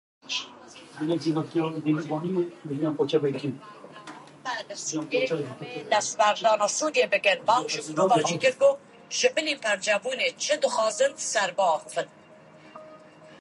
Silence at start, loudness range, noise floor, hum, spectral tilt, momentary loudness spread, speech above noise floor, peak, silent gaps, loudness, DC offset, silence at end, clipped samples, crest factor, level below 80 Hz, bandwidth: 0.25 s; 6 LU; -51 dBFS; none; -3.5 dB/octave; 16 LU; 26 dB; -8 dBFS; none; -26 LUFS; under 0.1%; 0.05 s; under 0.1%; 20 dB; -78 dBFS; 11.5 kHz